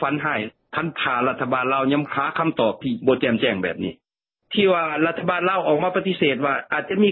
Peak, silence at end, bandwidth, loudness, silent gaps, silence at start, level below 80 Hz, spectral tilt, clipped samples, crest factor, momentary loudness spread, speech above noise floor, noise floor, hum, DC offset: -6 dBFS; 0 s; 4.3 kHz; -22 LUFS; none; 0 s; -60 dBFS; -10.5 dB/octave; under 0.1%; 16 dB; 7 LU; 56 dB; -77 dBFS; none; under 0.1%